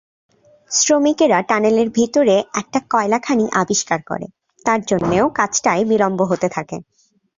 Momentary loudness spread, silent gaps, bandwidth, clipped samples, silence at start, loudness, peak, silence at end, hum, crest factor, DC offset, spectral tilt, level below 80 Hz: 9 LU; none; 7.8 kHz; under 0.1%; 0.7 s; -17 LUFS; -2 dBFS; 0.55 s; none; 16 dB; under 0.1%; -4 dB/octave; -54 dBFS